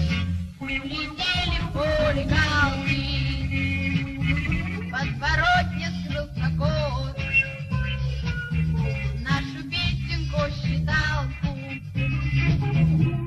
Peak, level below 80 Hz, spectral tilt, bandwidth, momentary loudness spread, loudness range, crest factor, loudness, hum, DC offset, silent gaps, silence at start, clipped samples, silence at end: -8 dBFS; -34 dBFS; -6 dB/octave; 11 kHz; 7 LU; 2 LU; 16 dB; -25 LUFS; none; under 0.1%; none; 0 s; under 0.1%; 0 s